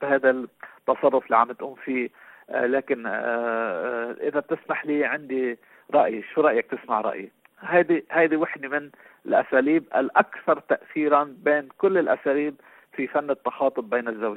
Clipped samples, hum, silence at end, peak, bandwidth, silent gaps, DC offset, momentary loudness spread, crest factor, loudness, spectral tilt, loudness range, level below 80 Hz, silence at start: under 0.1%; none; 0 s; -4 dBFS; 4.4 kHz; none; under 0.1%; 9 LU; 20 dB; -24 LUFS; -8.5 dB/octave; 4 LU; -72 dBFS; 0 s